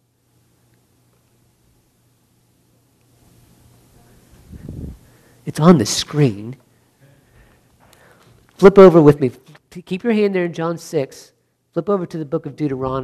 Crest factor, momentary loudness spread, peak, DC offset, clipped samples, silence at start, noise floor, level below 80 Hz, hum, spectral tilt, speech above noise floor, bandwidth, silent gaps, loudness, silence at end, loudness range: 18 dB; 26 LU; 0 dBFS; under 0.1%; 0.1%; 4.55 s; -60 dBFS; -48 dBFS; none; -6.5 dB/octave; 46 dB; 13.5 kHz; none; -15 LUFS; 0 s; 8 LU